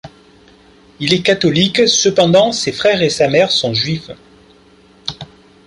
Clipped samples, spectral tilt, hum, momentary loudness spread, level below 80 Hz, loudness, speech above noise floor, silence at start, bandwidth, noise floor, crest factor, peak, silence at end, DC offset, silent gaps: under 0.1%; -3.5 dB/octave; none; 15 LU; -50 dBFS; -13 LUFS; 33 dB; 0.05 s; 11.5 kHz; -47 dBFS; 14 dB; 0 dBFS; 0.45 s; under 0.1%; none